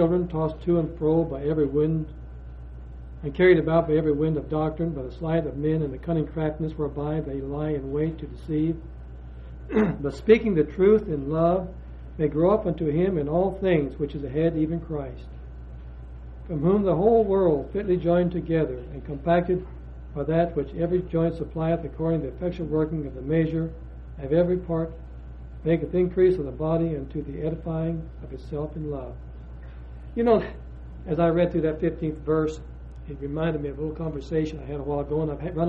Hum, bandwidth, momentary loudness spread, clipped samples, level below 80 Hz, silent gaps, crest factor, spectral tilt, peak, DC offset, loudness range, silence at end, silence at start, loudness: none; 7.2 kHz; 21 LU; under 0.1%; -40 dBFS; none; 20 dB; -9.5 dB/octave; -6 dBFS; under 0.1%; 5 LU; 0 s; 0 s; -25 LUFS